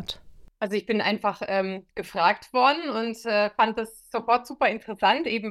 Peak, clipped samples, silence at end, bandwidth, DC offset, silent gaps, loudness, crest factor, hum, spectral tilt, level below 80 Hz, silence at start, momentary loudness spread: -6 dBFS; under 0.1%; 0 s; 15 kHz; under 0.1%; none; -25 LUFS; 20 dB; none; -4.5 dB/octave; -60 dBFS; 0 s; 11 LU